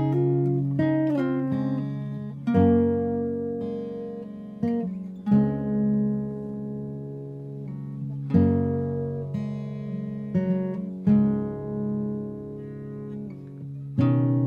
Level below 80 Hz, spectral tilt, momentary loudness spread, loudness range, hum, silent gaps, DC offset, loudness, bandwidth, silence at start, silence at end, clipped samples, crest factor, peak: -54 dBFS; -11 dB/octave; 15 LU; 3 LU; none; none; under 0.1%; -26 LUFS; 5 kHz; 0 s; 0 s; under 0.1%; 18 dB; -8 dBFS